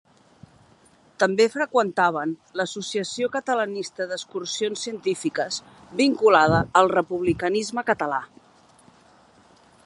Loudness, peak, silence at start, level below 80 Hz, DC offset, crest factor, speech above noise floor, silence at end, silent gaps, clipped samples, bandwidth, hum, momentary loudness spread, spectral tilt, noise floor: -23 LUFS; -2 dBFS; 1.2 s; -56 dBFS; under 0.1%; 22 dB; 33 dB; 1.6 s; none; under 0.1%; 11.5 kHz; none; 11 LU; -4.5 dB/octave; -56 dBFS